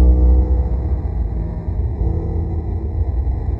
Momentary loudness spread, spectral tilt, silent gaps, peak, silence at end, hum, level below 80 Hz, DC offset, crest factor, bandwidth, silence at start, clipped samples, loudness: 8 LU; -12 dB/octave; none; -4 dBFS; 0 s; none; -18 dBFS; under 0.1%; 12 dB; 2.2 kHz; 0 s; under 0.1%; -20 LUFS